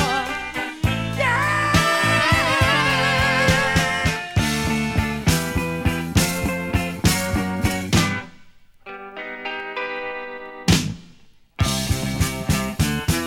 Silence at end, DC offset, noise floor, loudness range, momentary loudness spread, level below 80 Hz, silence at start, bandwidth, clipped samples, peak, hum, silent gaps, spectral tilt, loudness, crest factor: 0 s; under 0.1%; -49 dBFS; 8 LU; 12 LU; -34 dBFS; 0 s; 17.5 kHz; under 0.1%; -2 dBFS; none; none; -4 dB/octave; -20 LUFS; 20 dB